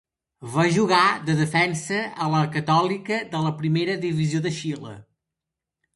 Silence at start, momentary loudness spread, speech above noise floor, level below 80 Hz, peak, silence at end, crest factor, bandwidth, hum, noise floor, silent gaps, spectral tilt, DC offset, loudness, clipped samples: 0.4 s; 10 LU; 63 dB; -62 dBFS; -4 dBFS; 0.95 s; 20 dB; 11.5 kHz; none; -86 dBFS; none; -5.5 dB/octave; under 0.1%; -23 LUFS; under 0.1%